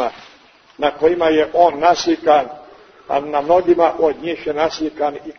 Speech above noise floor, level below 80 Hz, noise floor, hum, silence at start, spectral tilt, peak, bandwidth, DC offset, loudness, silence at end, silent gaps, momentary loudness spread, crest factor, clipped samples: 32 dB; -52 dBFS; -48 dBFS; none; 0 s; -4.5 dB/octave; 0 dBFS; 6.6 kHz; under 0.1%; -16 LUFS; 0.05 s; none; 9 LU; 16 dB; under 0.1%